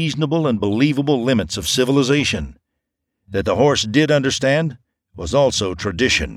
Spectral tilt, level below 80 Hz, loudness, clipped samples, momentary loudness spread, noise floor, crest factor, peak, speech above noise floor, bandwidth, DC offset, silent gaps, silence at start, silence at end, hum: -4.5 dB/octave; -40 dBFS; -18 LUFS; under 0.1%; 8 LU; -78 dBFS; 16 dB; -2 dBFS; 60 dB; 15 kHz; under 0.1%; none; 0 s; 0 s; none